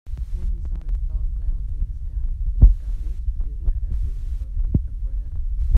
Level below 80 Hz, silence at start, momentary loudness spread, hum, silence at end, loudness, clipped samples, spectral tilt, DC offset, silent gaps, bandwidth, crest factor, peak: -22 dBFS; 0.05 s; 13 LU; none; 0 s; -27 LUFS; under 0.1%; -10.5 dB/octave; under 0.1%; none; 1.1 kHz; 20 dB; 0 dBFS